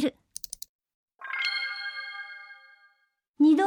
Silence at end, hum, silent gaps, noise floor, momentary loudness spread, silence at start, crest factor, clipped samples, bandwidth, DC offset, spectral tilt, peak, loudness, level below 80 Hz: 0 s; none; 0.69-0.79 s, 0.94-1.08 s, 3.29-3.34 s; -72 dBFS; 20 LU; 0 s; 16 dB; under 0.1%; over 20 kHz; under 0.1%; -2.5 dB/octave; -12 dBFS; -30 LUFS; -74 dBFS